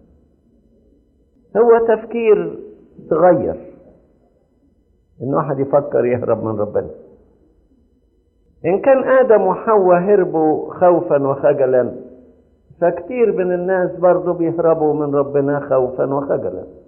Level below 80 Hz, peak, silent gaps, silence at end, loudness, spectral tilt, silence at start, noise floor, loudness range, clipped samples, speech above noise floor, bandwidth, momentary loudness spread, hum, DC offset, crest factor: -54 dBFS; -2 dBFS; none; 0.15 s; -16 LUFS; -12.5 dB/octave; 1.55 s; -58 dBFS; 6 LU; under 0.1%; 43 dB; 3 kHz; 9 LU; none; under 0.1%; 16 dB